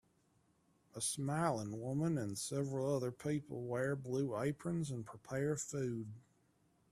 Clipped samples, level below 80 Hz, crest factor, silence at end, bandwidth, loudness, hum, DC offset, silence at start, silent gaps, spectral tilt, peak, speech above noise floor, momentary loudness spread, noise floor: under 0.1%; -72 dBFS; 20 dB; 0.7 s; 14.5 kHz; -40 LUFS; none; under 0.1%; 0.95 s; none; -5.5 dB/octave; -20 dBFS; 36 dB; 7 LU; -75 dBFS